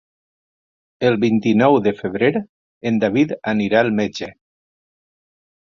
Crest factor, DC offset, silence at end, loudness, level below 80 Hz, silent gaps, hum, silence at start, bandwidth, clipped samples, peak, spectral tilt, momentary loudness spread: 18 dB; under 0.1%; 1.35 s; -18 LUFS; -58 dBFS; 2.49-2.81 s; none; 1 s; 7.2 kHz; under 0.1%; -2 dBFS; -7 dB/octave; 11 LU